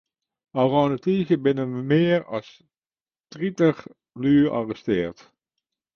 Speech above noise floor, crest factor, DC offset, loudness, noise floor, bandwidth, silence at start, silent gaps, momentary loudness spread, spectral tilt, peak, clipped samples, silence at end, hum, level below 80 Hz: over 68 dB; 18 dB; under 0.1%; -23 LUFS; under -90 dBFS; 6.8 kHz; 0.55 s; 3.20-3.24 s; 12 LU; -8 dB/octave; -6 dBFS; under 0.1%; 0.85 s; none; -58 dBFS